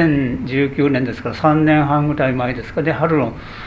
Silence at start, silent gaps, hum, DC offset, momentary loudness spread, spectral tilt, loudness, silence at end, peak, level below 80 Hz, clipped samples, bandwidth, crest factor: 0 s; none; none; under 0.1%; 7 LU; -9 dB/octave; -17 LUFS; 0 s; 0 dBFS; -40 dBFS; under 0.1%; 7.2 kHz; 16 dB